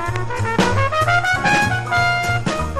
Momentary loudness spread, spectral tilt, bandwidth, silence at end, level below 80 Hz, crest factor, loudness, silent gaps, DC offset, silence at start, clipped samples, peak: 5 LU; -4.5 dB/octave; 13.5 kHz; 0 s; -34 dBFS; 14 dB; -17 LUFS; none; under 0.1%; 0 s; under 0.1%; -4 dBFS